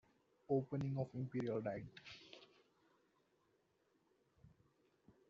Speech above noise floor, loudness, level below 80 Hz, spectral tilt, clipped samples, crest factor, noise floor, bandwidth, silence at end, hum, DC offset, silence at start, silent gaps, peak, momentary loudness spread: 37 dB; -43 LUFS; -78 dBFS; -7.5 dB/octave; under 0.1%; 22 dB; -80 dBFS; 7.4 kHz; 0.8 s; none; under 0.1%; 0.5 s; none; -26 dBFS; 17 LU